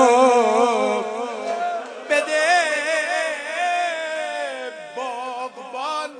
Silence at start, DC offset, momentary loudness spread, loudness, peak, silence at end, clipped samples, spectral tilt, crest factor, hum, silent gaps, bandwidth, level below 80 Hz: 0 s; under 0.1%; 13 LU; -21 LUFS; -2 dBFS; 0 s; under 0.1%; -2 dB/octave; 18 dB; none; none; 10.5 kHz; -82 dBFS